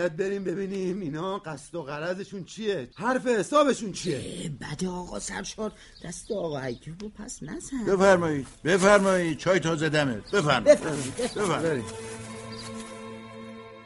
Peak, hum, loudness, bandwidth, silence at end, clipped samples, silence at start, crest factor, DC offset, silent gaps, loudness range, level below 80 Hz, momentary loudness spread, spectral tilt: -4 dBFS; none; -26 LUFS; 11.5 kHz; 0 s; under 0.1%; 0 s; 22 dB; under 0.1%; none; 10 LU; -54 dBFS; 18 LU; -5 dB/octave